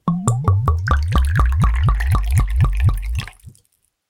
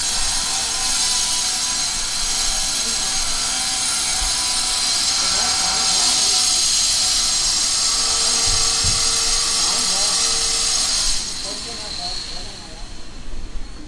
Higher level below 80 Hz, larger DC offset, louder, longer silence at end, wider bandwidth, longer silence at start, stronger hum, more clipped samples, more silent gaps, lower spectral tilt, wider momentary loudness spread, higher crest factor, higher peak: first, -20 dBFS vs -34 dBFS; neither; second, -19 LUFS vs -16 LUFS; first, 0.6 s vs 0 s; first, 16 kHz vs 12 kHz; about the same, 0.05 s vs 0 s; neither; neither; neither; first, -6.5 dB/octave vs 1 dB/octave; second, 7 LU vs 12 LU; about the same, 16 dB vs 16 dB; about the same, -2 dBFS vs -4 dBFS